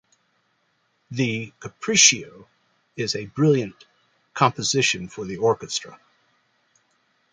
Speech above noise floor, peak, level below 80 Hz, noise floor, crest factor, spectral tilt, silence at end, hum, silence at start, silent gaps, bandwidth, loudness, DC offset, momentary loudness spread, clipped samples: 46 dB; 0 dBFS; -62 dBFS; -69 dBFS; 24 dB; -3 dB/octave; 1.4 s; none; 1.1 s; none; 10.5 kHz; -21 LUFS; under 0.1%; 20 LU; under 0.1%